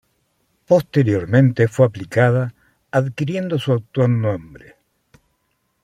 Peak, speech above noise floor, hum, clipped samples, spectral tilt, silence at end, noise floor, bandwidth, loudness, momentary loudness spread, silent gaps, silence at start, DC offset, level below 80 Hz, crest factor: -2 dBFS; 51 dB; none; under 0.1%; -8 dB/octave; 1.25 s; -68 dBFS; 13.5 kHz; -18 LUFS; 7 LU; none; 0.7 s; under 0.1%; -56 dBFS; 18 dB